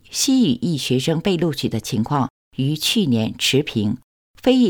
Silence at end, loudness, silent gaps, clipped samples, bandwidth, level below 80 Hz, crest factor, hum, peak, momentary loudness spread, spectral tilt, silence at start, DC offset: 0 s; -20 LUFS; 2.30-2.51 s, 4.03-4.34 s; under 0.1%; 19.5 kHz; -52 dBFS; 16 dB; none; -2 dBFS; 6 LU; -4.5 dB/octave; 0.1 s; under 0.1%